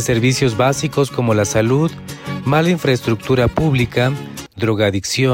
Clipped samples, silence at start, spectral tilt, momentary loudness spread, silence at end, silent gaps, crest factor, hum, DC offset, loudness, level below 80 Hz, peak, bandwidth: under 0.1%; 0 s; -5.5 dB/octave; 7 LU; 0 s; none; 14 dB; none; under 0.1%; -17 LUFS; -40 dBFS; -2 dBFS; 16.5 kHz